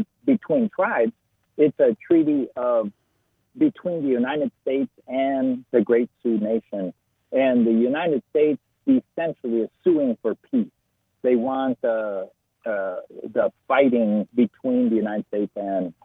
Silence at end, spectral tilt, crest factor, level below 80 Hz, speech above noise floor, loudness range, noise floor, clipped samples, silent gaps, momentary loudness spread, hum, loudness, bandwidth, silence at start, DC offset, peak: 0.15 s; -9.5 dB/octave; 18 dB; -68 dBFS; 48 dB; 3 LU; -70 dBFS; under 0.1%; none; 9 LU; none; -23 LUFS; 3.9 kHz; 0 s; under 0.1%; -6 dBFS